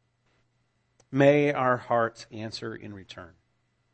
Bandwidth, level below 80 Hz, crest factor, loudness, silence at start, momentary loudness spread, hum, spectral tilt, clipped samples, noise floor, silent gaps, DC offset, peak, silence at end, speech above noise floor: 8.6 kHz; -68 dBFS; 22 dB; -25 LUFS; 1.15 s; 22 LU; none; -6.5 dB/octave; under 0.1%; -72 dBFS; none; under 0.1%; -6 dBFS; 0.7 s; 46 dB